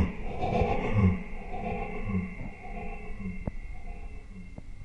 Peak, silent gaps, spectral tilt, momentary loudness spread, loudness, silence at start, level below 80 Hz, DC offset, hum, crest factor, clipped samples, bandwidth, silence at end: -12 dBFS; none; -8.5 dB/octave; 19 LU; -32 LUFS; 0 s; -38 dBFS; under 0.1%; none; 20 dB; under 0.1%; 8 kHz; 0 s